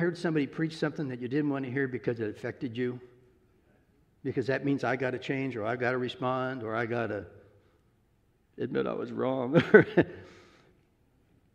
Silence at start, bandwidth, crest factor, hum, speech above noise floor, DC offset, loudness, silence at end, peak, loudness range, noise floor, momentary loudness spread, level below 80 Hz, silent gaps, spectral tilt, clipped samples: 0 s; 9.6 kHz; 28 dB; none; 39 dB; under 0.1%; -30 LUFS; 1.2 s; -2 dBFS; 7 LU; -68 dBFS; 10 LU; -68 dBFS; none; -7.5 dB/octave; under 0.1%